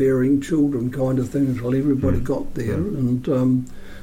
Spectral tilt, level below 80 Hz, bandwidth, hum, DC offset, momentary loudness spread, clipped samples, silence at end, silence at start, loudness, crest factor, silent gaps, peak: -8.5 dB/octave; -38 dBFS; 16 kHz; none; under 0.1%; 5 LU; under 0.1%; 0 s; 0 s; -21 LUFS; 12 dB; none; -8 dBFS